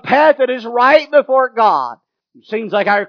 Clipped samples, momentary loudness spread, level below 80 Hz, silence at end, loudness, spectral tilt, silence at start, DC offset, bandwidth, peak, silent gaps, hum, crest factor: under 0.1%; 11 LU; -66 dBFS; 0 s; -13 LUFS; -5.5 dB/octave; 0.05 s; under 0.1%; 5.4 kHz; 0 dBFS; none; none; 14 dB